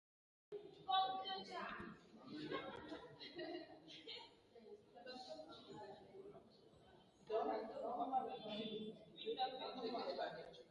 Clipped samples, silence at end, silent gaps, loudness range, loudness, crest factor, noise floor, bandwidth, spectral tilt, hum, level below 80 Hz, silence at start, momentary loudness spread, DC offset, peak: under 0.1%; 0 s; none; 10 LU; -48 LUFS; 22 dB; -68 dBFS; 11 kHz; -5 dB/octave; none; -82 dBFS; 0.5 s; 19 LU; under 0.1%; -28 dBFS